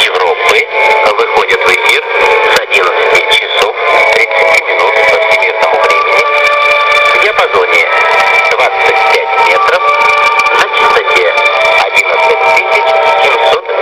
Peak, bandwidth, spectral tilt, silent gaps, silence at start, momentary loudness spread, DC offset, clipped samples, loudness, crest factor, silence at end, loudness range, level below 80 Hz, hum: 0 dBFS; 16 kHz; -1 dB/octave; none; 0 s; 2 LU; under 0.1%; 1%; -7 LUFS; 8 dB; 0 s; 1 LU; -48 dBFS; none